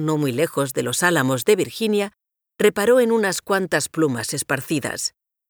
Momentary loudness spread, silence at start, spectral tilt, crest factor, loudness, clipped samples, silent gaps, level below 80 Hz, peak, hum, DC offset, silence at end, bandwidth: 8 LU; 0 s; -4 dB/octave; 18 dB; -20 LUFS; under 0.1%; none; -62 dBFS; -4 dBFS; none; under 0.1%; 0.4 s; over 20 kHz